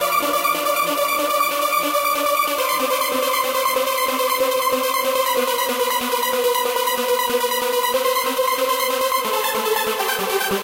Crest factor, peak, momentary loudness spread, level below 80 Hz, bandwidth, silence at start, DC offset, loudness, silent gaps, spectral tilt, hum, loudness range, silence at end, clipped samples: 14 dB; -6 dBFS; 1 LU; -60 dBFS; 16 kHz; 0 s; under 0.1%; -19 LUFS; none; -1 dB/octave; none; 1 LU; 0 s; under 0.1%